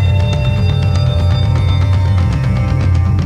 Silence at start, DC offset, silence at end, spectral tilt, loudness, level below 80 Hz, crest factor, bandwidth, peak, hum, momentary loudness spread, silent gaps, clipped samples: 0 s; under 0.1%; 0 s; -7.5 dB/octave; -14 LUFS; -22 dBFS; 10 dB; 8.6 kHz; -2 dBFS; none; 1 LU; none; under 0.1%